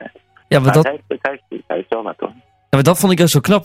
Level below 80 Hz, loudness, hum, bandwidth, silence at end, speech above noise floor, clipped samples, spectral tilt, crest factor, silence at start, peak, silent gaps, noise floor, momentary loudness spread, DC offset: -50 dBFS; -15 LUFS; none; 16.5 kHz; 0 s; 26 dB; under 0.1%; -5.5 dB/octave; 14 dB; 0 s; -2 dBFS; none; -39 dBFS; 14 LU; under 0.1%